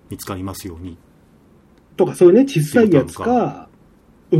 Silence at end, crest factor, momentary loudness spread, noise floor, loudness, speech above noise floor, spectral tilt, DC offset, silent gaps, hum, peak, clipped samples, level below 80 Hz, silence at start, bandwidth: 0 s; 16 dB; 20 LU; -51 dBFS; -16 LUFS; 35 dB; -7 dB/octave; under 0.1%; none; none; 0 dBFS; under 0.1%; -52 dBFS; 0.1 s; 16 kHz